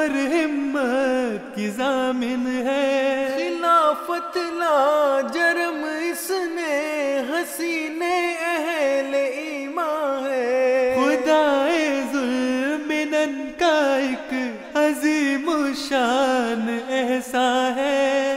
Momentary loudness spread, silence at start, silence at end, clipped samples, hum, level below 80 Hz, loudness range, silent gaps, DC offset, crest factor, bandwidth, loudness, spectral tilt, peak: 7 LU; 0 s; 0 s; under 0.1%; none; -62 dBFS; 3 LU; none; under 0.1%; 14 dB; 16 kHz; -22 LUFS; -3 dB/octave; -6 dBFS